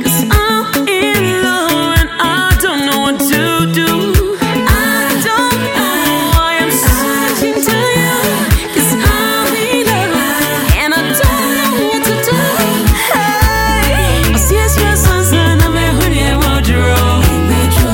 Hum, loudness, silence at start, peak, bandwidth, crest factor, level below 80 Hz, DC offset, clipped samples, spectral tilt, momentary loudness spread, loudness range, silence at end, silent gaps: none; -11 LUFS; 0 s; 0 dBFS; 17 kHz; 12 dB; -18 dBFS; under 0.1%; under 0.1%; -4 dB/octave; 2 LU; 1 LU; 0 s; none